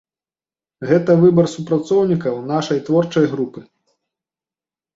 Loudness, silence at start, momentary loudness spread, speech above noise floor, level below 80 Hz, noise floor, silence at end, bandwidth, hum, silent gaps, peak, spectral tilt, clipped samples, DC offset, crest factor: -17 LUFS; 0.8 s; 10 LU; over 74 dB; -58 dBFS; under -90 dBFS; 1.35 s; 8 kHz; none; none; -2 dBFS; -7.5 dB/octave; under 0.1%; under 0.1%; 16 dB